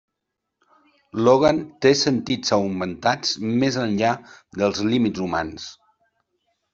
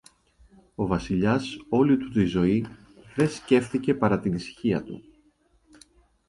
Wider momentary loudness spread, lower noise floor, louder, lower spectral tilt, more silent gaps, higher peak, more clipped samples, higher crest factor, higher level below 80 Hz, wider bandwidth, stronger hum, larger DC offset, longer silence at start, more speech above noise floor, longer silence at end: about the same, 14 LU vs 12 LU; first, -81 dBFS vs -64 dBFS; first, -21 LUFS vs -25 LUFS; second, -5 dB/octave vs -7 dB/octave; neither; first, -4 dBFS vs -8 dBFS; neither; about the same, 20 dB vs 20 dB; second, -56 dBFS vs -50 dBFS; second, 7.8 kHz vs 11.5 kHz; neither; neither; first, 1.15 s vs 0.8 s; first, 60 dB vs 40 dB; second, 1 s vs 1.3 s